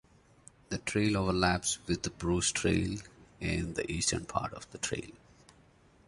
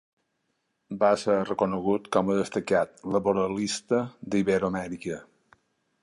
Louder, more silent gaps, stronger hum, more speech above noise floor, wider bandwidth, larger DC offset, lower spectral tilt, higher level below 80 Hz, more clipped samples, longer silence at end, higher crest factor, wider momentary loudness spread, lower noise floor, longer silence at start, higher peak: second, -32 LUFS vs -27 LUFS; neither; neither; second, 30 dB vs 50 dB; about the same, 11.5 kHz vs 11.5 kHz; neither; second, -4 dB/octave vs -5.5 dB/octave; first, -48 dBFS vs -60 dBFS; neither; about the same, 0.9 s vs 0.8 s; first, 24 dB vs 18 dB; about the same, 11 LU vs 9 LU; second, -62 dBFS vs -76 dBFS; second, 0.7 s vs 0.9 s; about the same, -10 dBFS vs -8 dBFS